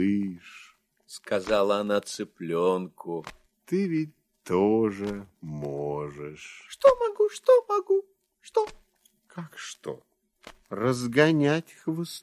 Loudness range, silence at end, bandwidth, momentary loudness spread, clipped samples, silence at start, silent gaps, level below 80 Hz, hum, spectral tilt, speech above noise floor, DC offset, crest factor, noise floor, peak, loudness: 4 LU; 0.05 s; 14 kHz; 20 LU; under 0.1%; 0 s; none; -62 dBFS; none; -6 dB/octave; 36 dB; under 0.1%; 22 dB; -62 dBFS; -6 dBFS; -26 LUFS